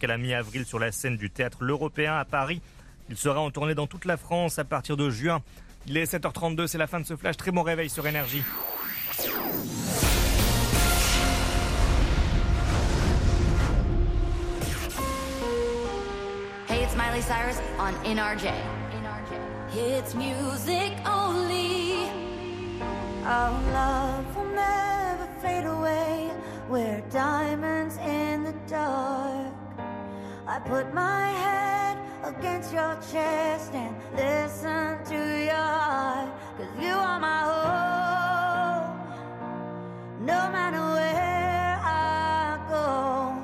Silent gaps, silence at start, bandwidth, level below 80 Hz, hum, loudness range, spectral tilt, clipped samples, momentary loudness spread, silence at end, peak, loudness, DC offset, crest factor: none; 0 s; 15.5 kHz; -34 dBFS; none; 4 LU; -4.5 dB/octave; under 0.1%; 9 LU; 0 s; -10 dBFS; -28 LUFS; under 0.1%; 18 dB